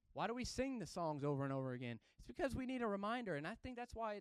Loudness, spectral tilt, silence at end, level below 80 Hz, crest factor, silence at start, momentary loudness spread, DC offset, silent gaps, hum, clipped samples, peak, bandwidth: -44 LUFS; -6 dB/octave; 0 s; -64 dBFS; 16 dB; 0.15 s; 8 LU; under 0.1%; none; none; under 0.1%; -28 dBFS; 13.5 kHz